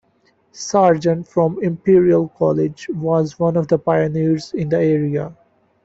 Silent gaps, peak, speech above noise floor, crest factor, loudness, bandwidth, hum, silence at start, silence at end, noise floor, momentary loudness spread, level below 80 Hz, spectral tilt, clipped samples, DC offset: none; -2 dBFS; 43 dB; 16 dB; -17 LUFS; 8 kHz; none; 0.55 s; 0.5 s; -60 dBFS; 8 LU; -54 dBFS; -7.5 dB/octave; under 0.1%; under 0.1%